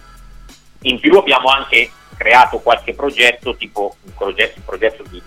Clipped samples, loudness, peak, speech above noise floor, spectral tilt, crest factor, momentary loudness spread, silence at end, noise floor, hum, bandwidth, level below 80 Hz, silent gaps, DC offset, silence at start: under 0.1%; -13 LUFS; 0 dBFS; 25 dB; -3 dB/octave; 16 dB; 13 LU; 0.05 s; -39 dBFS; none; 16.5 kHz; -40 dBFS; none; under 0.1%; 0.8 s